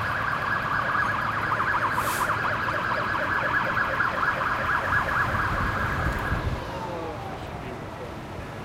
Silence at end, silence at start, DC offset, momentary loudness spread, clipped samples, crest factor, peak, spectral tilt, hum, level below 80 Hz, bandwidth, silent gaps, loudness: 0 s; 0 s; under 0.1%; 11 LU; under 0.1%; 14 dB; -12 dBFS; -5 dB/octave; none; -40 dBFS; 16 kHz; none; -26 LUFS